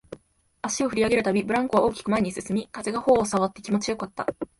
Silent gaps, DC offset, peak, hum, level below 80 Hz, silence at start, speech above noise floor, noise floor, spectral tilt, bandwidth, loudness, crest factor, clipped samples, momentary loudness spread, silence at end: none; under 0.1%; -6 dBFS; none; -54 dBFS; 0.1 s; 34 dB; -58 dBFS; -5 dB/octave; 11.5 kHz; -25 LUFS; 18 dB; under 0.1%; 9 LU; 0.15 s